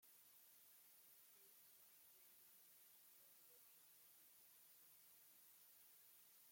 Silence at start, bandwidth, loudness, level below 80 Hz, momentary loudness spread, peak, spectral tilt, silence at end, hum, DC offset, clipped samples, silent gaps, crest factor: 0 s; 17 kHz; -67 LUFS; under -90 dBFS; 1 LU; -56 dBFS; 0.5 dB/octave; 0 s; none; under 0.1%; under 0.1%; none; 14 dB